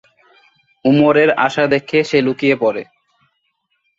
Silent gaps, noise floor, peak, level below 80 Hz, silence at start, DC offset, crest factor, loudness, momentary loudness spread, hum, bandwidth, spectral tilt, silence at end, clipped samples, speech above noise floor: none; -67 dBFS; 0 dBFS; -58 dBFS; 0.85 s; under 0.1%; 16 dB; -14 LUFS; 7 LU; none; 7.8 kHz; -6.5 dB/octave; 1.15 s; under 0.1%; 54 dB